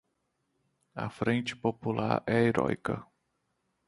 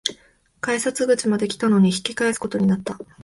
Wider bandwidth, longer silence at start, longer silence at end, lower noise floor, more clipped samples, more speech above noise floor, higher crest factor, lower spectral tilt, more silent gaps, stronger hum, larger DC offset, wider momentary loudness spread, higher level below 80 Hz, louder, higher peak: about the same, 11.5 kHz vs 11.5 kHz; first, 0.95 s vs 0.05 s; first, 0.85 s vs 0.2 s; first, -79 dBFS vs -56 dBFS; neither; first, 49 dB vs 35 dB; about the same, 22 dB vs 22 dB; first, -7 dB/octave vs -5 dB/octave; neither; neither; neither; first, 13 LU vs 9 LU; about the same, -62 dBFS vs -58 dBFS; second, -31 LUFS vs -21 LUFS; second, -10 dBFS vs 0 dBFS